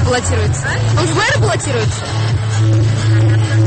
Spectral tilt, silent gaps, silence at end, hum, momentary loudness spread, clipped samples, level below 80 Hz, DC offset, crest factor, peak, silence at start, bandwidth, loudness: -5 dB/octave; none; 0 s; none; 4 LU; under 0.1%; -32 dBFS; under 0.1%; 8 dB; -4 dBFS; 0 s; 8.8 kHz; -14 LUFS